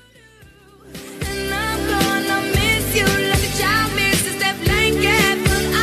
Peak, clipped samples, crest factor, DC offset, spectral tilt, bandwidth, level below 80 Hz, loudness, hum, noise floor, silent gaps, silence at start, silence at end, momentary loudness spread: -4 dBFS; under 0.1%; 14 dB; under 0.1%; -3.5 dB/octave; 14 kHz; -32 dBFS; -17 LUFS; none; -47 dBFS; none; 0.85 s; 0 s; 8 LU